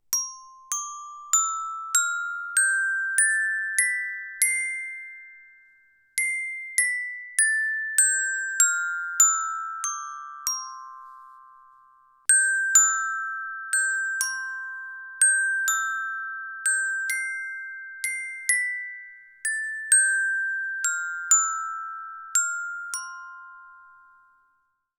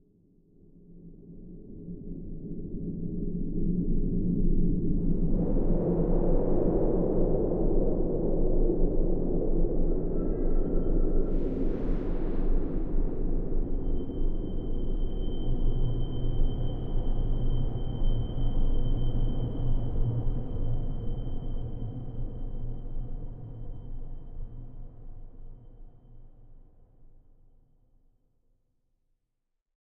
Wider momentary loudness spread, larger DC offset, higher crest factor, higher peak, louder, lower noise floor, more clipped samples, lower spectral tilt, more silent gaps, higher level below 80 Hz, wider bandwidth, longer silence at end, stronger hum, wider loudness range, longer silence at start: about the same, 17 LU vs 17 LU; neither; first, 24 dB vs 14 dB; first, -2 dBFS vs -12 dBFS; first, -23 LUFS vs -32 LUFS; second, -71 dBFS vs -80 dBFS; neither; second, 8 dB/octave vs -12 dB/octave; neither; second, -82 dBFS vs -28 dBFS; first, over 20 kHz vs 3.3 kHz; second, 1.1 s vs 3.3 s; neither; second, 5 LU vs 14 LU; second, 0.1 s vs 0.9 s